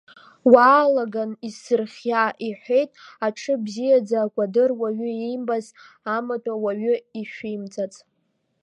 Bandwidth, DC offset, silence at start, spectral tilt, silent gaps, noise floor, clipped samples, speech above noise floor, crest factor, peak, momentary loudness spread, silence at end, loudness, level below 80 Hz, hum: 9.4 kHz; under 0.1%; 0.45 s; -5.5 dB/octave; none; -71 dBFS; under 0.1%; 49 dB; 22 dB; 0 dBFS; 15 LU; 0.65 s; -22 LUFS; -74 dBFS; none